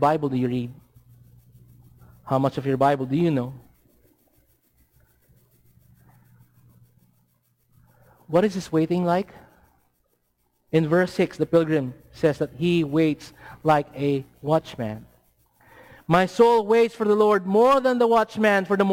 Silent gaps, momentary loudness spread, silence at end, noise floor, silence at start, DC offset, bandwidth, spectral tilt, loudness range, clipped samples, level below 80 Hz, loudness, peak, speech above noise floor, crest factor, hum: none; 12 LU; 0 s; -70 dBFS; 0 s; under 0.1%; 16.5 kHz; -7 dB/octave; 8 LU; under 0.1%; -60 dBFS; -22 LUFS; -8 dBFS; 49 dB; 16 dB; none